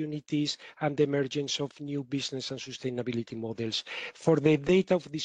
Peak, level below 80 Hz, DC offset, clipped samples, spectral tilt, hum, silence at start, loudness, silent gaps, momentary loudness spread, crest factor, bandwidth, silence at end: -10 dBFS; -62 dBFS; under 0.1%; under 0.1%; -5.5 dB/octave; none; 0 s; -30 LUFS; none; 11 LU; 20 dB; 9.6 kHz; 0 s